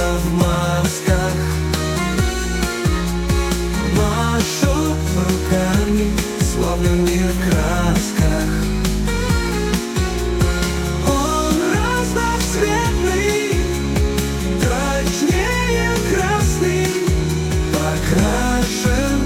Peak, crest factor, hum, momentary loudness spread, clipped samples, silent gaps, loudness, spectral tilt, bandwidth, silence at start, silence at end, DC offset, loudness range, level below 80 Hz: -2 dBFS; 16 dB; none; 3 LU; under 0.1%; none; -18 LUFS; -5 dB/octave; 17 kHz; 0 s; 0 s; under 0.1%; 1 LU; -24 dBFS